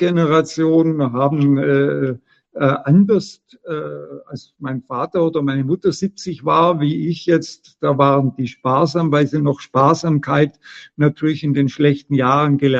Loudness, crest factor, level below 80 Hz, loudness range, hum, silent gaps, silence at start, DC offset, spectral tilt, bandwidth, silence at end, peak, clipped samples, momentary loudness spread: -17 LUFS; 16 dB; -58 dBFS; 3 LU; none; none; 0 s; under 0.1%; -7.5 dB/octave; 8 kHz; 0 s; 0 dBFS; under 0.1%; 13 LU